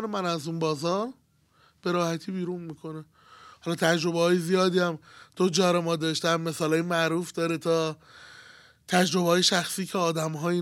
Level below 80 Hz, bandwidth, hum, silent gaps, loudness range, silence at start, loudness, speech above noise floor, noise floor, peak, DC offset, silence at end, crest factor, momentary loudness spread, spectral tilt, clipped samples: -72 dBFS; 16.5 kHz; none; none; 6 LU; 0 s; -26 LUFS; 37 dB; -63 dBFS; -8 dBFS; under 0.1%; 0 s; 20 dB; 12 LU; -4.5 dB/octave; under 0.1%